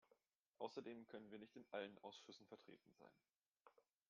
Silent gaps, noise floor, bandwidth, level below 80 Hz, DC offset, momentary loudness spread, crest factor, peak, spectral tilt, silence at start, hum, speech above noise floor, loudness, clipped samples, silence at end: 0.36-0.54 s, 3.36-3.40 s, 3.46-3.55 s; -83 dBFS; 7 kHz; under -90 dBFS; under 0.1%; 11 LU; 24 dB; -36 dBFS; -3 dB/octave; 0.1 s; none; 25 dB; -57 LUFS; under 0.1%; 0.3 s